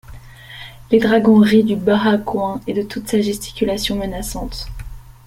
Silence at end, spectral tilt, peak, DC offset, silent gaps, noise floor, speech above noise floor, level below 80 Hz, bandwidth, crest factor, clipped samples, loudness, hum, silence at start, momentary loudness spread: 0.25 s; -5.5 dB/octave; -2 dBFS; under 0.1%; none; -37 dBFS; 21 dB; -36 dBFS; 16 kHz; 16 dB; under 0.1%; -17 LUFS; none; 0.1 s; 23 LU